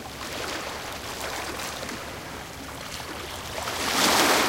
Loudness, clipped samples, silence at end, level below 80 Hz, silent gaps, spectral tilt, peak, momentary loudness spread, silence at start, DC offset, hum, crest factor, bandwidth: -28 LUFS; under 0.1%; 0 s; -50 dBFS; none; -2 dB/octave; -6 dBFS; 16 LU; 0 s; under 0.1%; none; 24 dB; 17 kHz